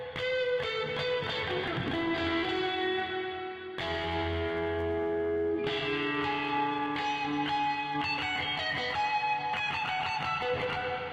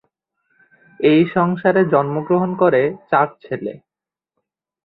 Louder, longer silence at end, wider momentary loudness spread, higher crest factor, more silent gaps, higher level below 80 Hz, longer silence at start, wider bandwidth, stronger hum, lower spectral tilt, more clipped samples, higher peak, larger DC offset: second, -31 LUFS vs -17 LUFS; second, 0 s vs 1.1 s; second, 2 LU vs 12 LU; about the same, 12 dB vs 16 dB; neither; about the same, -58 dBFS vs -60 dBFS; second, 0 s vs 1 s; first, 10.5 kHz vs 4.7 kHz; neither; second, -5.5 dB/octave vs -11.5 dB/octave; neither; second, -20 dBFS vs -2 dBFS; neither